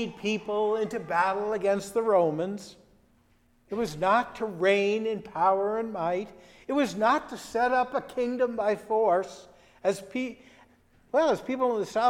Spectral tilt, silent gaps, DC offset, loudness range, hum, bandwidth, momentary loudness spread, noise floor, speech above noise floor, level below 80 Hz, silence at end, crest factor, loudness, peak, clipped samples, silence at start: -5 dB/octave; none; under 0.1%; 2 LU; none; 15.5 kHz; 9 LU; -64 dBFS; 37 dB; -62 dBFS; 0 s; 18 dB; -27 LUFS; -10 dBFS; under 0.1%; 0 s